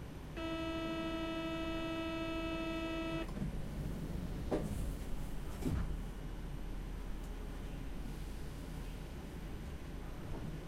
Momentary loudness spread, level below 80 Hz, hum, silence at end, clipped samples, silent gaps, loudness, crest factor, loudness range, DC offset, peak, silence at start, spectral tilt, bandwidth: 8 LU; -46 dBFS; none; 0 s; under 0.1%; none; -43 LUFS; 16 dB; 7 LU; under 0.1%; -24 dBFS; 0 s; -6 dB/octave; 16 kHz